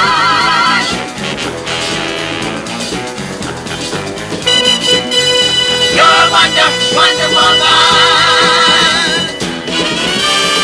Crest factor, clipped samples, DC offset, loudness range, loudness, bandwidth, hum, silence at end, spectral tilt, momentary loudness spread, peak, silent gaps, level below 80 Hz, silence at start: 12 dB; 0.2%; under 0.1%; 10 LU; -9 LUFS; 11 kHz; none; 0 s; -2 dB/octave; 12 LU; 0 dBFS; none; -42 dBFS; 0 s